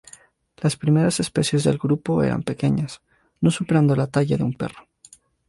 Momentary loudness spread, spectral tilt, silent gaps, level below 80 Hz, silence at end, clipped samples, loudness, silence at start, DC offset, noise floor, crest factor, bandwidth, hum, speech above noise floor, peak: 7 LU; -6.5 dB/octave; none; -50 dBFS; 0.7 s; under 0.1%; -22 LUFS; 0.6 s; under 0.1%; -52 dBFS; 16 dB; 11.5 kHz; none; 32 dB; -6 dBFS